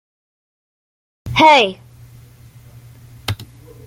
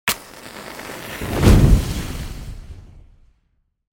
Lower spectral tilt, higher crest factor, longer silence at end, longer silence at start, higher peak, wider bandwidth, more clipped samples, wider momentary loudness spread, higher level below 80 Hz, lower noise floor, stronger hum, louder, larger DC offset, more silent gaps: about the same, -4.5 dB/octave vs -5.5 dB/octave; about the same, 18 dB vs 20 dB; second, 0.45 s vs 0.9 s; first, 1.25 s vs 0.05 s; about the same, -2 dBFS vs 0 dBFS; about the same, 16.5 kHz vs 17 kHz; neither; second, 20 LU vs 23 LU; second, -48 dBFS vs -24 dBFS; second, -43 dBFS vs -66 dBFS; neither; first, -14 LUFS vs -19 LUFS; neither; neither